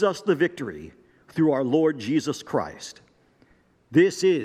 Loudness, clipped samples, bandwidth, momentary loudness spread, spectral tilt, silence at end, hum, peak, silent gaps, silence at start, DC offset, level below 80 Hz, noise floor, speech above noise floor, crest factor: -24 LUFS; under 0.1%; 14 kHz; 15 LU; -6 dB/octave; 0 s; none; -6 dBFS; none; 0 s; under 0.1%; -66 dBFS; -60 dBFS; 37 dB; 18 dB